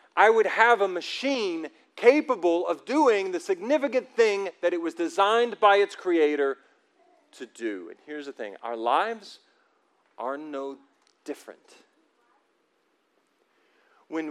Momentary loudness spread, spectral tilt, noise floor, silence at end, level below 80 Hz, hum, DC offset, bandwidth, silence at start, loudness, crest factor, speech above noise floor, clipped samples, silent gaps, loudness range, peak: 19 LU; -3 dB/octave; -70 dBFS; 0 s; under -90 dBFS; none; under 0.1%; 11.5 kHz; 0.15 s; -25 LUFS; 22 dB; 46 dB; under 0.1%; none; 16 LU; -4 dBFS